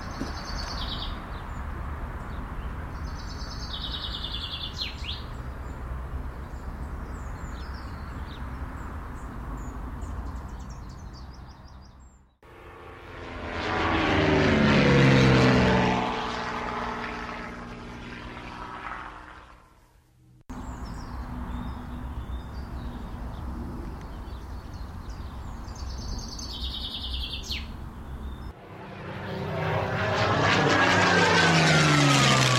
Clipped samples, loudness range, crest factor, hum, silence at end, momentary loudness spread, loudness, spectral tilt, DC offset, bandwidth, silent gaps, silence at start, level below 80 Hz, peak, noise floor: under 0.1%; 18 LU; 20 dB; none; 0 s; 21 LU; -26 LUFS; -5 dB/octave; under 0.1%; 15 kHz; none; 0 s; -38 dBFS; -8 dBFS; -58 dBFS